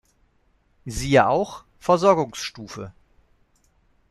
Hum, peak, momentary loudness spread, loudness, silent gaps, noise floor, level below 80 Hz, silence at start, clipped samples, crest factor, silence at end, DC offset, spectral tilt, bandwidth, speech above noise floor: none; -4 dBFS; 20 LU; -21 LUFS; none; -64 dBFS; -46 dBFS; 0.85 s; under 0.1%; 20 dB; 1.2 s; under 0.1%; -5 dB/octave; 13.5 kHz; 43 dB